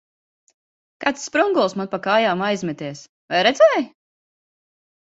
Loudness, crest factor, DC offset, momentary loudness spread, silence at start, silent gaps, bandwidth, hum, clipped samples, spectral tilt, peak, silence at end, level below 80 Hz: -19 LUFS; 20 dB; under 0.1%; 16 LU; 1 s; 3.09-3.28 s; 8 kHz; none; under 0.1%; -4 dB/octave; -2 dBFS; 1.15 s; -68 dBFS